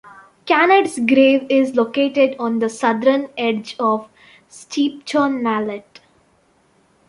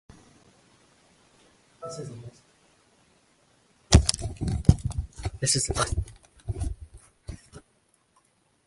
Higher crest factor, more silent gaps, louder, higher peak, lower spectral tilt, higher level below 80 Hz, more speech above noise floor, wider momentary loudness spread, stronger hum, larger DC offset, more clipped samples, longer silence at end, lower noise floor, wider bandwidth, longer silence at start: second, 16 dB vs 30 dB; neither; first, -17 LUFS vs -26 LUFS; about the same, -2 dBFS vs 0 dBFS; about the same, -4.5 dB/octave vs -4.5 dB/octave; second, -66 dBFS vs -34 dBFS; about the same, 41 dB vs 38 dB; second, 9 LU vs 24 LU; neither; neither; neither; first, 1.3 s vs 1.05 s; second, -58 dBFS vs -67 dBFS; about the same, 11.5 kHz vs 11.5 kHz; second, 0.05 s vs 1.8 s